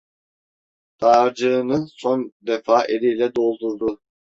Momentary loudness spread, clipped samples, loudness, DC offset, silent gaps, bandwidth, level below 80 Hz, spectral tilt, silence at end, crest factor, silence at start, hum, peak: 9 LU; under 0.1%; -20 LUFS; under 0.1%; 2.32-2.40 s; 7.8 kHz; -62 dBFS; -6 dB/octave; 0.25 s; 18 dB; 1 s; none; -2 dBFS